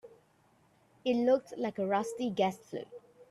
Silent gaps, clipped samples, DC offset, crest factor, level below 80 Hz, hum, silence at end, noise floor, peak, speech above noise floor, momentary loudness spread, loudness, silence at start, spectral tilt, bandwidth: none; under 0.1%; under 0.1%; 18 dB; -76 dBFS; none; 0.1 s; -68 dBFS; -16 dBFS; 36 dB; 15 LU; -33 LUFS; 0.05 s; -5.5 dB/octave; 12.5 kHz